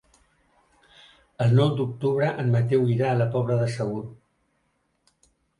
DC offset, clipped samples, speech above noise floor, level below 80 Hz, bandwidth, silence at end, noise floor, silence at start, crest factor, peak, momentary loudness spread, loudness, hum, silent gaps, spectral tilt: under 0.1%; under 0.1%; 49 dB; -60 dBFS; 11 kHz; 1.45 s; -71 dBFS; 1.4 s; 16 dB; -8 dBFS; 9 LU; -24 LUFS; none; none; -8 dB/octave